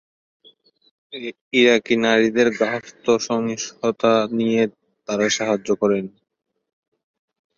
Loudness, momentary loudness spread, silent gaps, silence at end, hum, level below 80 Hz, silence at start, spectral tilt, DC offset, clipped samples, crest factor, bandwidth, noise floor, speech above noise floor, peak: -20 LUFS; 15 LU; 1.41-1.51 s; 1.5 s; none; -64 dBFS; 1.1 s; -4 dB/octave; under 0.1%; under 0.1%; 18 dB; 7.6 kHz; -55 dBFS; 35 dB; -4 dBFS